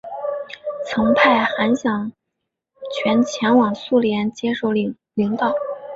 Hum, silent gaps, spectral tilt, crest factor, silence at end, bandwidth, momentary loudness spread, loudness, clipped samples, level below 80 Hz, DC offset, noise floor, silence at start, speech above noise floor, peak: none; none; -5.5 dB/octave; 18 dB; 0 s; 7.8 kHz; 13 LU; -19 LUFS; under 0.1%; -58 dBFS; under 0.1%; -79 dBFS; 0.05 s; 61 dB; -2 dBFS